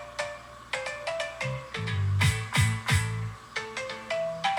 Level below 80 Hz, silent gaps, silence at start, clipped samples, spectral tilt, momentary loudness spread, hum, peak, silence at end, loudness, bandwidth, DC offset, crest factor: -50 dBFS; none; 0 s; under 0.1%; -4.5 dB/octave; 10 LU; none; -12 dBFS; 0 s; -30 LUFS; 17.5 kHz; under 0.1%; 18 dB